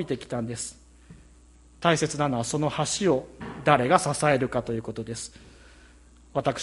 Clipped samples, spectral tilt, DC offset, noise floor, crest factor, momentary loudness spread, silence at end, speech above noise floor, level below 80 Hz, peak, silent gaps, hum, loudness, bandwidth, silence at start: under 0.1%; -4.5 dB/octave; under 0.1%; -54 dBFS; 24 dB; 13 LU; 0 s; 28 dB; -54 dBFS; -4 dBFS; none; none; -26 LUFS; 11.5 kHz; 0 s